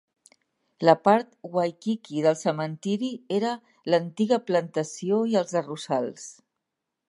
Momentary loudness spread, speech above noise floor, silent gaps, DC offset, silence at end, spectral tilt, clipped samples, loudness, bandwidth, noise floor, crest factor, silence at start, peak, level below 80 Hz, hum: 9 LU; 59 dB; none; under 0.1%; 0.8 s; -5.5 dB/octave; under 0.1%; -26 LUFS; 11.5 kHz; -84 dBFS; 22 dB; 0.8 s; -4 dBFS; -80 dBFS; none